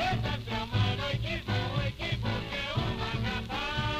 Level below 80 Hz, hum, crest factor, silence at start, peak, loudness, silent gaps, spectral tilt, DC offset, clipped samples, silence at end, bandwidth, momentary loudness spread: -42 dBFS; none; 16 dB; 0 s; -16 dBFS; -32 LUFS; none; -6 dB/octave; under 0.1%; under 0.1%; 0 s; 14 kHz; 3 LU